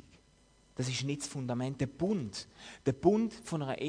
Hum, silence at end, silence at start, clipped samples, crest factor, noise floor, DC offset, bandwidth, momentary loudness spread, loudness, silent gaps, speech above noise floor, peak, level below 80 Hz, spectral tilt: none; 0 s; 0.75 s; under 0.1%; 22 dB; -65 dBFS; under 0.1%; 10.5 kHz; 13 LU; -34 LUFS; none; 31 dB; -12 dBFS; -62 dBFS; -5.5 dB/octave